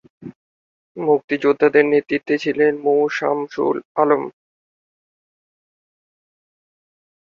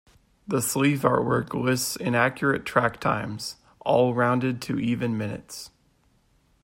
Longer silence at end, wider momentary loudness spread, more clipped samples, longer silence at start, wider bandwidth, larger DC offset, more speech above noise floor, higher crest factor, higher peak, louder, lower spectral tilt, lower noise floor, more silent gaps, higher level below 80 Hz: first, 2.9 s vs 0.95 s; second, 7 LU vs 12 LU; neither; second, 0.2 s vs 0.5 s; second, 7 kHz vs 16 kHz; neither; first, over 72 dB vs 40 dB; about the same, 18 dB vs 20 dB; first, -2 dBFS vs -6 dBFS; first, -18 LUFS vs -25 LUFS; first, -6.5 dB/octave vs -5 dB/octave; first, under -90 dBFS vs -64 dBFS; first, 0.36-0.95 s, 1.24-1.28 s, 3.85-3.95 s vs none; second, -66 dBFS vs -58 dBFS